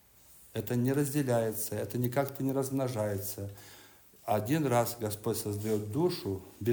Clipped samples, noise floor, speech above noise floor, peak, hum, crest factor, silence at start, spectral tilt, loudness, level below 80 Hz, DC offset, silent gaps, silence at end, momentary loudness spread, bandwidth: under 0.1%; -58 dBFS; 26 dB; -14 dBFS; none; 18 dB; 0.3 s; -6 dB/octave; -32 LUFS; -68 dBFS; under 0.1%; none; 0 s; 10 LU; over 20 kHz